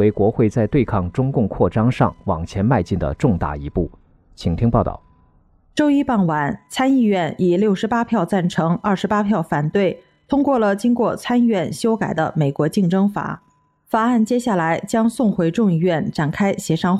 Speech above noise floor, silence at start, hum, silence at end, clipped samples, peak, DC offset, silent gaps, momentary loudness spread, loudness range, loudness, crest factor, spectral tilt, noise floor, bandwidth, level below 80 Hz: 37 dB; 0 s; none; 0 s; under 0.1%; -2 dBFS; under 0.1%; none; 7 LU; 3 LU; -19 LUFS; 16 dB; -7 dB/octave; -55 dBFS; 13.5 kHz; -40 dBFS